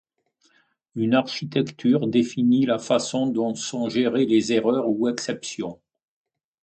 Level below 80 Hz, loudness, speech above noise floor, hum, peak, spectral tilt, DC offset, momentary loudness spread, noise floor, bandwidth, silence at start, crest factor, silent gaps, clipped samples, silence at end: -66 dBFS; -23 LUFS; 44 dB; none; -6 dBFS; -5 dB/octave; under 0.1%; 9 LU; -66 dBFS; 9 kHz; 0.95 s; 18 dB; none; under 0.1%; 0.9 s